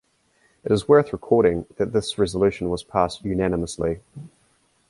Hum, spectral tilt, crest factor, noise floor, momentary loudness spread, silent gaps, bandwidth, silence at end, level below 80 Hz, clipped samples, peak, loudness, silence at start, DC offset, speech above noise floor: none; -6 dB/octave; 20 dB; -63 dBFS; 11 LU; none; 11.5 kHz; 0.6 s; -44 dBFS; under 0.1%; -4 dBFS; -22 LUFS; 0.65 s; under 0.1%; 42 dB